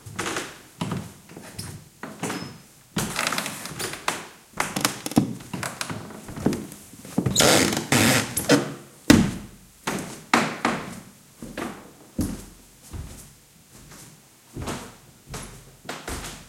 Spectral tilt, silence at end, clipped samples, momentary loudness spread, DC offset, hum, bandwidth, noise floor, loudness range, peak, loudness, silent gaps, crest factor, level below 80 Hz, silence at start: -3.5 dB/octave; 0 s; under 0.1%; 23 LU; under 0.1%; none; 16.5 kHz; -51 dBFS; 17 LU; 0 dBFS; -25 LUFS; none; 28 dB; -48 dBFS; 0.05 s